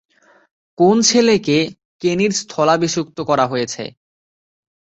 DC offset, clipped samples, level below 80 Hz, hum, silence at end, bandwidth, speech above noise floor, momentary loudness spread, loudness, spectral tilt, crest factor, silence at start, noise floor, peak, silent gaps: under 0.1%; under 0.1%; -58 dBFS; none; 1 s; 8.2 kHz; over 74 dB; 12 LU; -16 LUFS; -4 dB/octave; 16 dB; 0.8 s; under -90 dBFS; -2 dBFS; 1.85-1.99 s